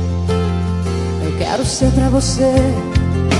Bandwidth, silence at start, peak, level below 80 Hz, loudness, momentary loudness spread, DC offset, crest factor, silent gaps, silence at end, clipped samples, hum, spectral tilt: 12 kHz; 0 s; -2 dBFS; -26 dBFS; -16 LUFS; 6 LU; under 0.1%; 14 dB; none; 0 s; under 0.1%; none; -6 dB/octave